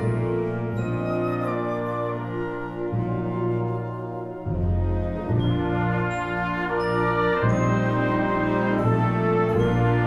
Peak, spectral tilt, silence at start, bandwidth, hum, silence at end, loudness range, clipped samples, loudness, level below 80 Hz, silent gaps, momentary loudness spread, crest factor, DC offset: -8 dBFS; -8.5 dB/octave; 0 s; 7.8 kHz; 60 Hz at -50 dBFS; 0 s; 5 LU; under 0.1%; -24 LUFS; -40 dBFS; none; 8 LU; 14 dB; under 0.1%